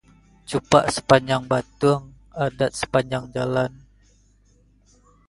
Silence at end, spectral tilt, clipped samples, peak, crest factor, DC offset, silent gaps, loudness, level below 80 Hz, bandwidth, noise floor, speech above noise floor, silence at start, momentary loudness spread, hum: 1.6 s; -5 dB/octave; under 0.1%; 0 dBFS; 24 dB; under 0.1%; none; -22 LUFS; -50 dBFS; 11.5 kHz; -57 dBFS; 37 dB; 0.5 s; 10 LU; 50 Hz at -50 dBFS